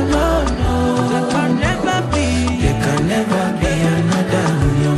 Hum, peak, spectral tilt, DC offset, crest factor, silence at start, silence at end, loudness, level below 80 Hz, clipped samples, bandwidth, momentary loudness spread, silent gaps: none; -2 dBFS; -6 dB/octave; under 0.1%; 14 dB; 0 s; 0 s; -17 LUFS; -26 dBFS; under 0.1%; 13 kHz; 2 LU; none